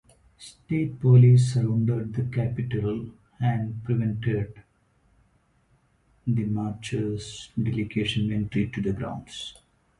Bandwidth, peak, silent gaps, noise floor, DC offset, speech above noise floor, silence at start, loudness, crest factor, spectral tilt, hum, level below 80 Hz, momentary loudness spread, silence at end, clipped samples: 10.5 kHz; -6 dBFS; none; -65 dBFS; under 0.1%; 41 dB; 0.4 s; -25 LUFS; 18 dB; -7.5 dB/octave; none; -52 dBFS; 17 LU; 0.5 s; under 0.1%